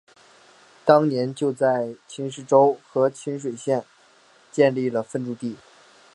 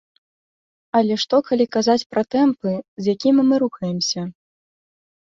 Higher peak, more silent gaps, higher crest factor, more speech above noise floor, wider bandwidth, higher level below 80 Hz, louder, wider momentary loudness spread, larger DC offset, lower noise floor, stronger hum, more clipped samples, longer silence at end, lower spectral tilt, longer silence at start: about the same, -2 dBFS vs -4 dBFS; second, none vs 2.06-2.10 s, 2.88-2.97 s; first, 22 dB vs 16 dB; second, 34 dB vs over 71 dB; first, 11 kHz vs 7.6 kHz; second, -74 dBFS vs -64 dBFS; second, -23 LUFS vs -19 LUFS; first, 14 LU vs 8 LU; neither; second, -55 dBFS vs under -90 dBFS; neither; neither; second, 0.6 s vs 1.1 s; first, -6.5 dB/octave vs -5 dB/octave; about the same, 0.85 s vs 0.95 s